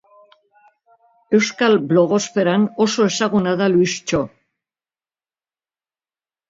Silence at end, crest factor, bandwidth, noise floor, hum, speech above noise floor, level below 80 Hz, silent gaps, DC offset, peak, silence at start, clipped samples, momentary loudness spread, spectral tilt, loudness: 2.25 s; 18 dB; 7.8 kHz; under -90 dBFS; none; over 73 dB; -56 dBFS; none; under 0.1%; -2 dBFS; 1.3 s; under 0.1%; 5 LU; -5 dB/octave; -17 LUFS